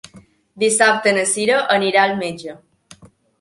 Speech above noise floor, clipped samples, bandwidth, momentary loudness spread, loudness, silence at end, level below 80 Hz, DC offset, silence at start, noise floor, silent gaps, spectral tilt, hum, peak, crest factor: 31 dB; under 0.1%; 11.5 kHz; 13 LU; -16 LUFS; 0.35 s; -64 dBFS; under 0.1%; 0.15 s; -47 dBFS; none; -2 dB/octave; none; -2 dBFS; 18 dB